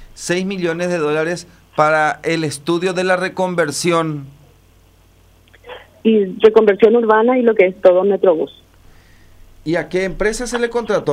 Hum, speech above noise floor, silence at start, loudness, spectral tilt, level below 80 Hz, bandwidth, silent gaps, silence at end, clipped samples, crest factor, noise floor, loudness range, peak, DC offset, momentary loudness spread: none; 35 dB; 0 s; -16 LUFS; -5 dB/octave; -44 dBFS; 15 kHz; none; 0 s; under 0.1%; 16 dB; -50 dBFS; 7 LU; 0 dBFS; under 0.1%; 11 LU